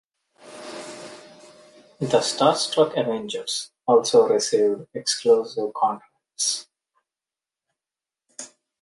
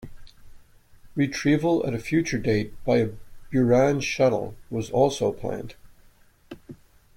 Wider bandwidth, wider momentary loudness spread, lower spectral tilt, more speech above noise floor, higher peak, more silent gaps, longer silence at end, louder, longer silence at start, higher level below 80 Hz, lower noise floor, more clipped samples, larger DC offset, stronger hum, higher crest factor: second, 11.5 kHz vs 16.5 kHz; first, 21 LU vs 12 LU; second, -3 dB/octave vs -6 dB/octave; first, over 69 dB vs 32 dB; first, -4 dBFS vs -8 dBFS; neither; about the same, 0.35 s vs 0.4 s; about the same, -22 LUFS vs -24 LUFS; first, 0.45 s vs 0 s; second, -70 dBFS vs -48 dBFS; first, under -90 dBFS vs -55 dBFS; neither; neither; neither; about the same, 20 dB vs 18 dB